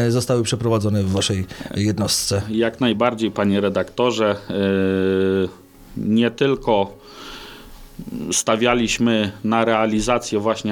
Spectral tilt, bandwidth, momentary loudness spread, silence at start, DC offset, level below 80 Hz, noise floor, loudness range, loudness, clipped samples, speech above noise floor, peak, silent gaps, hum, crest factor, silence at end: -5 dB/octave; 18.5 kHz; 10 LU; 0 s; under 0.1%; -46 dBFS; -40 dBFS; 2 LU; -20 LUFS; under 0.1%; 21 dB; -2 dBFS; none; none; 18 dB; 0 s